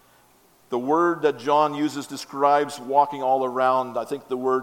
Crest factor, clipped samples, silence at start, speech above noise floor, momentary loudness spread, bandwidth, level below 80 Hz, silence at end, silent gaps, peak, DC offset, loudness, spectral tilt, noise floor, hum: 18 dB; under 0.1%; 0.7 s; 35 dB; 10 LU; 17 kHz; -74 dBFS; 0 s; none; -6 dBFS; under 0.1%; -23 LUFS; -5 dB/octave; -57 dBFS; none